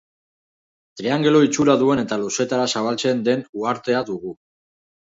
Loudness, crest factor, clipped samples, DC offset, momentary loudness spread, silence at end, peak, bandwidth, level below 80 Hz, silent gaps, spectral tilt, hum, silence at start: -20 LUFS; 18 dB; under 0.1%; under 0.1%; 11 LU; 0.75 s; -2 dBFS; 7.8 kHz; -62 dBFS; 3.49-3.53 s; -4.5 dB/octave; none; 0.95 s